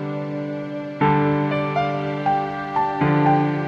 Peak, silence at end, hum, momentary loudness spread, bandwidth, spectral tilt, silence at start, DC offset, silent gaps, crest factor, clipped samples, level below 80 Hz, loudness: -6 dBFS; 0 s; none; 10 LU; 6.6 kHz; -8.5 dB/octave; 0 s; under 0.1%; none; 16 dB; under 0.1%; -52 dBFS; -21 LUFS